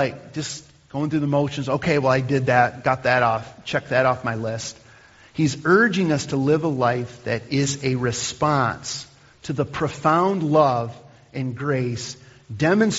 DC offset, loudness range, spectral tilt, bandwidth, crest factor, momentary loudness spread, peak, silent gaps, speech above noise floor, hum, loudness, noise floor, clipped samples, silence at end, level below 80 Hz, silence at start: under 0.1%; 2 LU; -5 dB/octave; 8 kHz; 20 dB; 13 LU; -2 dBFS; none; 28 dB; none; -22 LUFS; -49 dBFS; under 0.1%; 0 s; -54 dBFS; 0 s